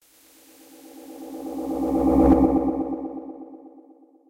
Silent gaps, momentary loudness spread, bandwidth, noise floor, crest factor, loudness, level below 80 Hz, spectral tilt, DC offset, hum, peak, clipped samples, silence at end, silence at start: none; 25 LU; 16 kHz; -54 dBFS; 18 dB; -22 LUFS; -38 dBFS; -9 dB/octave; under 0.1%; none; -6 dBFS; under 0.1%; 0.6 s; 0.9 s